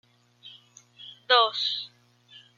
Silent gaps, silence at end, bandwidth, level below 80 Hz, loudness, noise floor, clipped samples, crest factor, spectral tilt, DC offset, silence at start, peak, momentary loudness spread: none; 0.7 s; 7.4 kHz; -88 dBFS; -23 LUFS; -55 dBFS; under 0.1%; 24 dB; 0 dB/octave; under 0.1%; 0.45 s; -6 dBFS; 25 LU